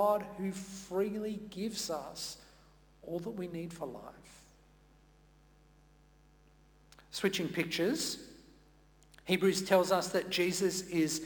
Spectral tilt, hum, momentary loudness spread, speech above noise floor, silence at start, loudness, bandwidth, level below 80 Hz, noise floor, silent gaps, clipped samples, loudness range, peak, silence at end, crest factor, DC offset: -4 dB/octave; none; 15 LU; 29 dB; 0 s; -34 LUFS; 19 kHz; -66 dBFS; -63 dBFS; none; under 0.1%; 14 LU; -14 dBFS; 0 s; 22 dB; under 0.1%